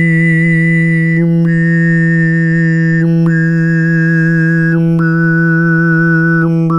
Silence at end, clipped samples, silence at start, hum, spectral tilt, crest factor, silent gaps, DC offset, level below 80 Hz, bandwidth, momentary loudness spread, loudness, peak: 0 s; under 0.1%; 0 s; none; -9.5 dB/octave; 8 dB; none; under 0.1%; -46 dBFS; 5.6 kHz; 1 LU; -10 LUFS; -2 dBFS